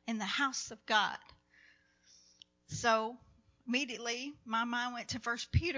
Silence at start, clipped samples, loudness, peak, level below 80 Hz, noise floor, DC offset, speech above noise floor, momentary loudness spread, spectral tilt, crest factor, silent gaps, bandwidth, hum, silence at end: 0.05 s; under 0.1%; -35 LUFS; -16 dBFS; -52 dBFS; -66 dBFS; under 0.1%; 31 dB; 12 LU; -3.5 dB/octave; 22 dB; none; 7.6 kHz; 60 Hz at -65 dBFS; 0 s